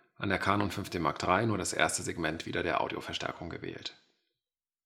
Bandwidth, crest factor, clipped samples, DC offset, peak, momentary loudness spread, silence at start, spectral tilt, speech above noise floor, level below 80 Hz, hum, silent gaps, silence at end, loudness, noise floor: 17 kHz; 24 dB; under 0.1%; under 0.1%; -8 dBFS; 12 LU; 0.2 s; -4 dB/octave; over 58 dB; -64 dBFS; none; none; 0.95 s; -32 LUFS; under -90 dBFS